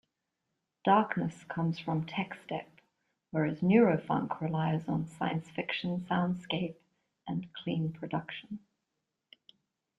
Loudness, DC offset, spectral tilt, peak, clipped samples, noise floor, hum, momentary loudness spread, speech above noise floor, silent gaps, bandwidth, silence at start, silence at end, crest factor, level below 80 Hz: -32 LUFS; under 0.1%; -8 dB/octave; -12 dBFS; under 0.1%; -85 dBFS; none; 13 LU; 54 dB; none; 11 kHz; 0.85 s; 1.4 s; 22 dB; -70 dBFS